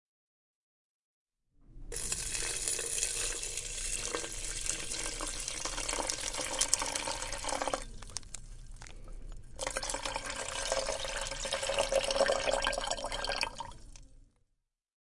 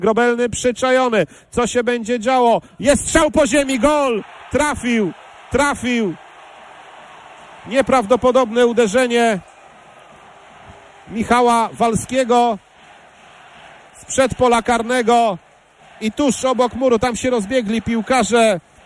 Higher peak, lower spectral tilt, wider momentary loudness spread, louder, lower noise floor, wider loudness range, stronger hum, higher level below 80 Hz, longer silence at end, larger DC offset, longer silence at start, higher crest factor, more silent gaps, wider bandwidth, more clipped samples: second, -4 dBFS vs 0 dBFS; second, -0.5 dB/octave vs -4 dB/octave; first, 17 LU vs 8 LU; second, -34 LUFS vs -17 LUFS; first, -81 dBFS vs -47 dBFS; about the same, 5 LU vs 3 LU; neither; second, -48 dBFS vs -42 dBFS; first, 0.75 s vs 0.25 s; neither; first, 1.6 s vs 0 s; first, 34 dB vs 16 dB; neither; about the same, 11.5 kHz vs 12 kHz; neither